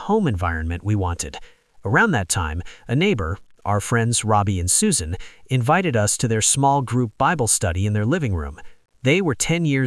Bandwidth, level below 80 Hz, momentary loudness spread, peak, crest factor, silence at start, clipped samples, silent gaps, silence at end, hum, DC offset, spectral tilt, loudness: 12 kHz; -42 dBFS; 11 LU; -4 dBFS; 18 dB; 0 s; under 0.1%; none; 0 s; none; under 0.1%; -4.5 dB/octave; -20 LUFS